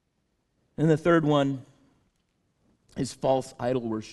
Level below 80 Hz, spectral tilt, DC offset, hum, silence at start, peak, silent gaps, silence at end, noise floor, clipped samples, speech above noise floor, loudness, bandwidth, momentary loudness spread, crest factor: -60 dBFS; -7 dB/octave; under 0.1%; none; 0.8 s; -8 dBFS; none; 0 s; -74 dBFS; under 0.1%; 49 dB; -26 LUFS; 12 kHz; 15 LU; 20 dB